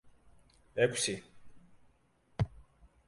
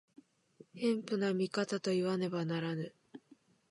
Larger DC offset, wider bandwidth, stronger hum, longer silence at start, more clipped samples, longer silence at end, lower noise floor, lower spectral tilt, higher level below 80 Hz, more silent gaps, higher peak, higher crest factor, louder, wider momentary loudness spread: neither; about the same, 11.5 kHz vs 11.5 kHz; neither; second, 0.05 s vs 0.75 s; neither; about the same, 0.45 s vs 0.55 s; about the same, -69 dBFS vs -66 dBFS; second, -4 dB/octave vs -6 dB/octave; first, -56 dBFS vs -84 dBFS; neither; first, -14 dBFS vs -20 dBFS; first, 24 dB vs 16 dB; about the same, -34 LUFS vs -35 LUFS; first, 14 LU vs 8 LU